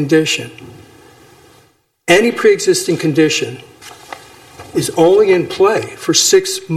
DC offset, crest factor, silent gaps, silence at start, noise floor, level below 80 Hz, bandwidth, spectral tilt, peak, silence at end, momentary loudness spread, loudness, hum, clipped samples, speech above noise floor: under 0.1%; 14 dB; none; 0 s; -53 dBFS; -54 dBFS; 15 kHz; -3.5 dB/octave; 0 dBFS; 0 s; 22 LU; -13 LUFS; none; under 0.1%; 40 dB